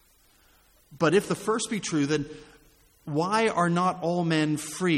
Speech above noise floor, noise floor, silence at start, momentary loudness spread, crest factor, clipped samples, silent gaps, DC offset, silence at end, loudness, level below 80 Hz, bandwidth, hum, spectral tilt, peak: 35 dB; -61 dBFS; 0.9 s; 7 LU; 16 dB; under 0.1%; none; under 0.1%; 0 s; -26 LUFS; -62 dBFS; 15.5 kHz; none; -5 dB/octave; -10 dBFS